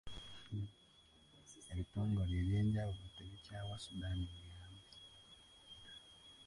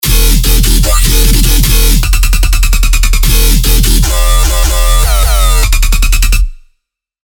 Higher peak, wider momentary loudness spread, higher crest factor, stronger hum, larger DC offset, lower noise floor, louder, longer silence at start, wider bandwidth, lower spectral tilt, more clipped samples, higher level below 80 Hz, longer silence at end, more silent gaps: second, -28 dBFS vs 0 dBFS; first, 21 LU vs 2 LU; first, 16 dB vs 6 dB; neither; neither; about the same, -67 dBFS vs -64 dBFS; second, -43 LUFS vs -10 LUFS; about the same, 0.05 s vs 0.05 s; second, 11.5 kHz vs 19.5 kHz; first, -6.5 dB/octave vs -3 dB/octave; second, under 0.1% vs 0.4%; second, -54 dBFS vs -8 dBFS; second, 0 s vs 0.7 s; neither